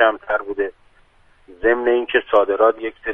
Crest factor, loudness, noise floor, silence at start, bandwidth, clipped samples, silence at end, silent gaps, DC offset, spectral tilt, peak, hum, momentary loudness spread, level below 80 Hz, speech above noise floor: 18 dB; -19 LUFS; -53 dBFS; 0 s; 3.8 kHz; under 0.1%; 0 s; none; under 0.1%; -6 dB/octave; 0 dBFS; none; 9 LU; -50 dBFS; 35 dB